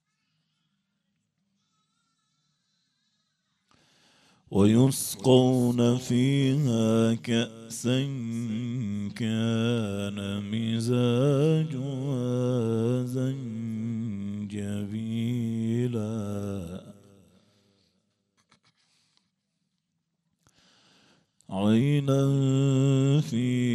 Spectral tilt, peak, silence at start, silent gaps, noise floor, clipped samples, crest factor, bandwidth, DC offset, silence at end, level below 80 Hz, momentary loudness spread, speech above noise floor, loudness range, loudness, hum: -6.5 dB/octave; -6 dBFS; 4.5 s; none; -79 dBFS; under 0.1%; 20 dB; 14.5 kHz; under 0.1%; 0 s; -68 dBFS; 10 LU; 54 dB; 9 LU; -26 LUFS; none